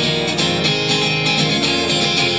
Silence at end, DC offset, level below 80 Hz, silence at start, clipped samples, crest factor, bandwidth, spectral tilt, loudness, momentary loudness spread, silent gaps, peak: 0 s; 0.3%; -46 dBFS; 0 s; under 0.1%; 14 dB; 8 kHz; -3.5 dB/octave; -15 LUFS; 2 LU; none; -4 dBFS